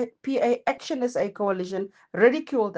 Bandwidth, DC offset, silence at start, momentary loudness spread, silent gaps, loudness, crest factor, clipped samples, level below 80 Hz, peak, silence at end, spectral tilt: 9 kHz; under 0.1%; 0 s; 10 LU; none; -25 LUFS; 18 dB; under 0.1%; -70 dBFS; -6 dBFS; 0 s; -5.5 dB/octave